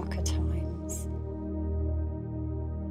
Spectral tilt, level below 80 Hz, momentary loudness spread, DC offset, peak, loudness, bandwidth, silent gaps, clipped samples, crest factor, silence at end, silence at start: -6.5 dB/octave; -34 dBFS; 5 LU; under 0.1%; -18 dBFS; -33 LUFS; 15 kHz; none; under 0.1%; 14 dB; 0 s; 0 s